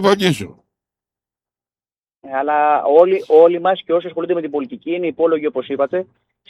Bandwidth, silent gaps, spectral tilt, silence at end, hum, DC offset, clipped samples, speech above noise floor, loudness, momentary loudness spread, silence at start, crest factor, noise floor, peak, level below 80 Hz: 13 kHz; 1.98-2.03 s; -6 dB/octave; 0.45 s; none; under 0.1%; under 0.1%; over 74 dB; -16 LUFS; 13 LU; 0 s; 18 dB; under -90 dBFS; 0 dBFS; -64 dBFS